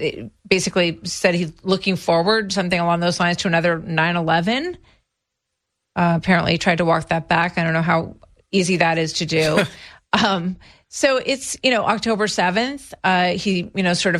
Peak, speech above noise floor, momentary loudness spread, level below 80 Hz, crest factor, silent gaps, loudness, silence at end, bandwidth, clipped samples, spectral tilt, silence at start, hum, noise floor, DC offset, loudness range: -2 dBFS; 59 dB; 6 LU; -50 dBFS; 18 dB; none; -19 LUFS; 0 s; 13.5 kHz; under 0.1%; -4.5 dB/octave; 0 s; none; -79 dBFS; under 0.1%; 2 LU